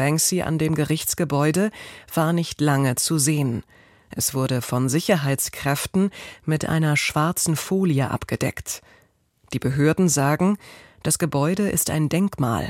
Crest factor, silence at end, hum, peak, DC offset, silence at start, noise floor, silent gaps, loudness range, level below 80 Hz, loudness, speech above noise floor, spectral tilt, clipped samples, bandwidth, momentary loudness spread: 16 dB; 0 s; none; -6 dBFS; under 0.1%; 0 s; -60 dBFS; none; 2 LU; -50 dBFS; -22 LUFS; 38 dB; -5 dB/octave; under 0.1%; 16.5 kHz; 8 LU